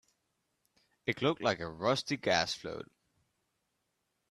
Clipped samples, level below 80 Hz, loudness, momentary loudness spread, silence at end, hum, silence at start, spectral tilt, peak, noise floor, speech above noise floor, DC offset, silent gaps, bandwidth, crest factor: under 0.1%; -70 dBFS; -33 LUFS; 13 LU; 1.45 s; none; 1.05 s; -4 dB/octave; -12 dBFS; -82 dBFS; 49 dB; under 0.1%; none; 13.5 kHz; 24 dB